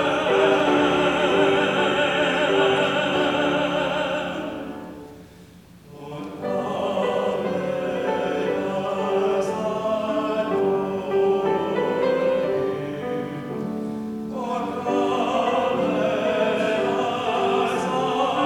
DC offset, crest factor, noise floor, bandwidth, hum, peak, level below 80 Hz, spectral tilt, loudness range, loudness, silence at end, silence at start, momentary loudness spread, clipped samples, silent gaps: under 0.1%; 16 dB; -47 dBFS; 13.5 kHz; none; -6 dBFS; -56 dBFS; -5 dB/octave; 7 LU; -22 LUFS; 0 s; 0 s; 11 LU; under 0.1%; none